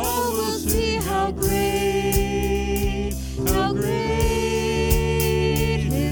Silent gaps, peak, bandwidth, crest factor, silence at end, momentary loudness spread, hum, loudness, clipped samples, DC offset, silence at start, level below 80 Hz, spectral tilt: none; -4 dBFS; over 20 kHz; 18 dB; 0 s; 3 LU; none; -22 LUFS; under 0.1%; under 0.1%; 0 s; -28 dBFS; -5 dB/octave